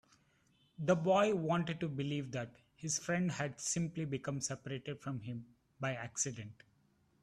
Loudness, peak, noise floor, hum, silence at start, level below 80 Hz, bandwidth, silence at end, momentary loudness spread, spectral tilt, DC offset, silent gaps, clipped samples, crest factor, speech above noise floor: -37 LUFS; -18 dBFS; -73 dBFS; none; 0.8 s; -72 dBFS; 12.5 kHz; 0.7 s; 14 LU; -4.5 dB/octave; under 0.1%; none; under 0.1%; 20 dB; 36 dB